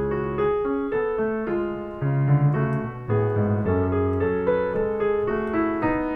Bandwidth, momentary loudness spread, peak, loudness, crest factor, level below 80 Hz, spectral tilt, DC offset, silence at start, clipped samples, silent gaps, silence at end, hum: 4 kHz; 5 LU; -10 dBFS; -24 LUFS; 14 dB; -44 dBFS; -11 dB/octave; under 0.1%; 0 s; under 0.1%; none; 0 s; none